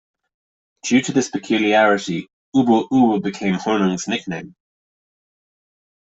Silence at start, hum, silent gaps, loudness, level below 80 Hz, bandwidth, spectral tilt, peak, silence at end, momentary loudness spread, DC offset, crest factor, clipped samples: 0.85 s; none; 2.33-2.52 s; -18 LUFS; -60 dBFS; 8 kHz; -5 dB/octave; -2 dBFS; 1.6 s; 12 LU; under 0.1%; 18 dB; under 0.1%